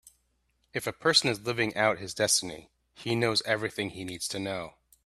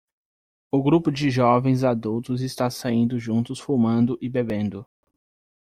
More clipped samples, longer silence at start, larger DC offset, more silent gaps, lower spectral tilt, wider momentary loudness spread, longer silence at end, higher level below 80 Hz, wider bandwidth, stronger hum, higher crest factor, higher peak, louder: neither; second, 0.05 s vs 0.75 s; neither; neither; second, -2.5 dB/octave vs -7.5 dB/octave; first, 14 LU vs 8 LU; second, 0.35 s vs 0.75 s; second, -66 dBFS vs -56 dBFS; about the same, 15 kHz vs 14.5 kHz; neither; about the same, 22 dB vs 18 dB; about the same, -8 dBFS vs -6 dBFS; second, -28 LUFS vs -23 LUFS